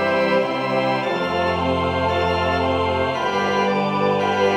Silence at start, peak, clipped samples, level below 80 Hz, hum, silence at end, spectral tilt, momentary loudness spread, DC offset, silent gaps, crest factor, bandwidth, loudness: 0 s; -6 dBFS; under 0.1%; -44 dBFS; none; 0 s; -6 dB/octave; 2 LU; under 0.1%; none; 14 dB; 11 kHz; -20 LUFS